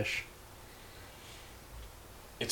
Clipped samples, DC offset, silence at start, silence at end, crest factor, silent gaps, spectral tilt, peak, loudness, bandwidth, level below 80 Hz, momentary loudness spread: under 0.1%; under 0.1%; 0 s; 0 s; 24 dB; none; -3 dB/octave; -20 dBFS; -45 LUFS; 19.5 kHz; -56 dBFS; 14 LU